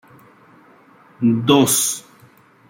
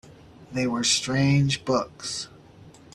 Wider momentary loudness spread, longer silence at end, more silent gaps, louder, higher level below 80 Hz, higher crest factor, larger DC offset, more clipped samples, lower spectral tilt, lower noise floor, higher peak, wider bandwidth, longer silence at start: second, 8 LU vs 12 LU; first, 0.7 s vs 0.25 s; neither; first, -16 LUFS vs -24 LUFS; second, -64 dBFS vs -54 dBFS; about the same, 18 dB vs 18 dB; neither; neither; about the same, -4 dB/octave vs -4 dB/octave; about the same, -50 dBFS vs -49 dBFS; first, -2 dBFS vs -8 dBFS; first, 16.5 kHz vs 12 kHz; first, 1.2 s vs 0.4 s